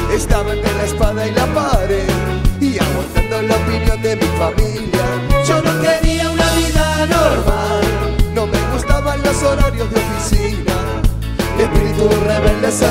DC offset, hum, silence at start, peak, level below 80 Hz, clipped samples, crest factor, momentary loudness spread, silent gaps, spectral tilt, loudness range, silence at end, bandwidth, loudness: under 0.1%; none; 0 s; 0 dBFS; -20 dBFS; under 0.1%; 14 dB; 4 LU; none; -5 dB/octave; 2 LU; 0 s; 16.5 kHz; -16 LUFS